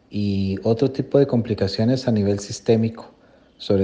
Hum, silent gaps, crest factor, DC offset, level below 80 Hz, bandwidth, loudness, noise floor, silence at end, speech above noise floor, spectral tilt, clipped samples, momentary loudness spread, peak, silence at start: none; none; 18 dB; under 0.1%; -56 dBFS; 9.6 kHz; -21 LUFS; -45 dBFS; 0 s; 25 dB; -7 dB/octave; under 0.1%; 6 LU; -4 dBFS; 0.1 s